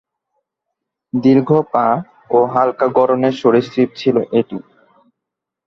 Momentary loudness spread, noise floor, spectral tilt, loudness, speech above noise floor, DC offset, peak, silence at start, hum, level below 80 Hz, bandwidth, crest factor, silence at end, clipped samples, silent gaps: 7 LU; -81 dBFS; -8 dB/octave; -15 LUFS; 67 dB; under 0.1%; -2 dBFS; 1.15 s; none; -60 dBFS; 6.8 kHz; 16 dB; 1.1 s; under 0.1%; none